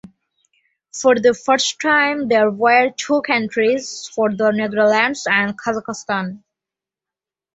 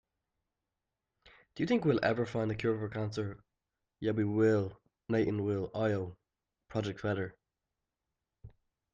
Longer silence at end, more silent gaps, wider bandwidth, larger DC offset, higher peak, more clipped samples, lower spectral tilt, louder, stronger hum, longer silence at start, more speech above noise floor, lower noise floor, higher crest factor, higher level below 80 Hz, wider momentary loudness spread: first, 1.15 s vs 0.45 s; neither; about the same, 8.2 kHz vs 7.6 kHz; neither; first, -2 dBFS vs -16 dBFS; neither; second, -3.5 dB/octave vs -7.5 dB/octave; first, -17 LUFS vs -33 LUFS; neither; second, 0.95 s vs 1.55 s; first, 71 dB vs 57 dB; about the same, -88 dBFS vs -89 dBFS; about the same, 18 dB vs 18 dB; about the same, -64 dBFS vs -66 dBFS; second, 9 LU vs 12 LU